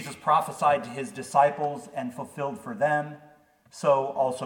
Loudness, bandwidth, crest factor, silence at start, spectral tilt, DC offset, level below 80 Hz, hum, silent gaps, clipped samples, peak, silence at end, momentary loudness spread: -26 LUFS; 17.5 kHz; 20 dB; 0 s; -5 dB/octave; under 0.1%; -72 dBFS; none; none; under 0.1%; -6 dBFS; 0 s; 12 LU